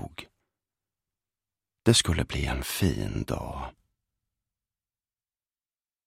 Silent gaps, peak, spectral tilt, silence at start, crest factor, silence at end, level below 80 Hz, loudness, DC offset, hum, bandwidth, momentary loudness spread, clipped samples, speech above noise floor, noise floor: none; -6 dBFS; -4 dB/octave; 0 s; 26 dB; 2.35 s; -42 dBFS; -27 LUFS; under 0.1%; none; 16 kHz; 19 LU; under 0.1%; over 63 dB; under -90 dBFS